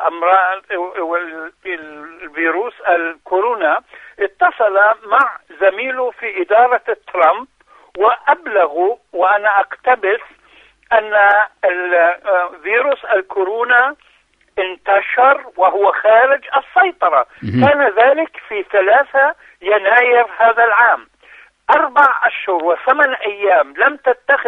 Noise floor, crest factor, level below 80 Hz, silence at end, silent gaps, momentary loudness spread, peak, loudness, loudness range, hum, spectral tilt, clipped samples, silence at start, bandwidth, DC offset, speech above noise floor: -55 dBFS; 14 dB; -60 dBFS; 0 s; none; 10 LU; 0 dBFS; -14 LUFS; 3 LU; none; -7 dB/octave; under 0.1%; 0 s; 5 kHz; under 0.1%; 41 dB